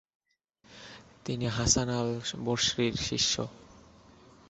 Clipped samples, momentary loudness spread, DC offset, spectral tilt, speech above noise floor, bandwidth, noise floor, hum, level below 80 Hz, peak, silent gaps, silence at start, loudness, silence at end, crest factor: under 0.1%; 22 LU; under 0.1%; -3 dB/octave; 37 dB; 8.2 kHz; -67 dBFS; none; -52 dBFS; -10 dBFS; none; 0.7 s; -29 LUFS; 0.7 s; 22 dB